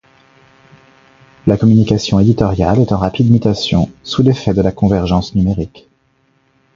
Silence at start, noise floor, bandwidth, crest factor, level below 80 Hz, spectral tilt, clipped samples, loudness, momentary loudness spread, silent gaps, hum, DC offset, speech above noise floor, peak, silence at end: 1.45 s; -58 dBFS; 7.6 kHz; 14 dB; -32 dBFS; -7.5 dB/octave; under 0.1%; -13 LUFS; 6 LU; none; none; under 0.1%; 45 dB; 0 dBFS; 1.1 s